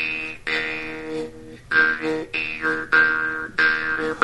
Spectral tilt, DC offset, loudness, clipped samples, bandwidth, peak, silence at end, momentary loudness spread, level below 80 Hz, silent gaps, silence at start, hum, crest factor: -4 dB/octave; 0.4%; -21 LUFS; under 0.1%; 11.5 kHz; -2 dBFS; 0 s; 13 LU; -52 dBFS; none; 0 s; none; 22 dB